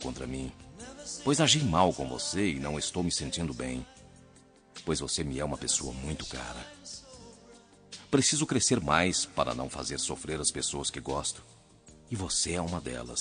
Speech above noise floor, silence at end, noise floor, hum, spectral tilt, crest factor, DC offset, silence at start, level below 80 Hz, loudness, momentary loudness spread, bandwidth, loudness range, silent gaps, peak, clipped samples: 27 dB; 0 s; -58 dBFS; none; -3.5 dB/octave; 24 dB; under 0.1%; 0 s; -52 dBFS; -30 LUFS; 18 LU; 10 kHz; 6 LU; none; -8 dBFS; under 0.1%